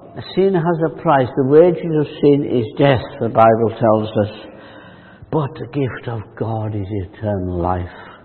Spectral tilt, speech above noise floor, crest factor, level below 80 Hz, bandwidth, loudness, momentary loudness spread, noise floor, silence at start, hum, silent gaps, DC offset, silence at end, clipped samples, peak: -11 dB/octave; 24 dB; 18 dB; -50 dBFS; 4.4 kHz; -17 LUFS; 12 LU; -41 dBFS; 0 s; none; none; under 0.1%; 0.1 s; under 0.1%; 0 dBFS